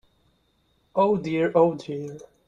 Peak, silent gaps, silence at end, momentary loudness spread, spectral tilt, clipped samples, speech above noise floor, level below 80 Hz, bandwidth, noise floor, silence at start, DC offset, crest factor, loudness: -6 dBFS; none; 0.25 s; 14 LU; -7.5 dB/octave; under 0.1%; 44 dB; -62 dBFS; 7.6 kHz; -67 dBFS; 0.95 s; under 0.1%; 20 dB; -24 LUFS